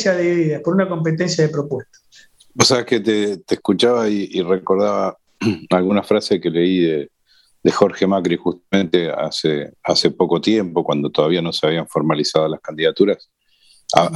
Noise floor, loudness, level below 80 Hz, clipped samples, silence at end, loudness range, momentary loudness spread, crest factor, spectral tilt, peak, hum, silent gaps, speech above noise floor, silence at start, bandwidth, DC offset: -57 dBFS; -18 LUFS; -58 dBFS; under 0.1%; 0 s; 1 LU; 6 LU; 18 dB; -5 dB/octave; 0 dBFS; none; none; 39 dB; 0 s; 12.5 kHz; under 0.1%